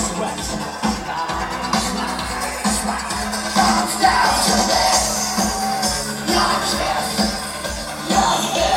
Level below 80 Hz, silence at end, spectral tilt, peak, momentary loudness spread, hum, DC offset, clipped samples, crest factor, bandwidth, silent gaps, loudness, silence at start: -36 dBFS; 0 s; -2.5 dB/octave; -2 dBFS; 9 LU; none; under 0.1%; under 0.1%; 16 dB; 16.5 kHz; none; -19 LUFS; 0 s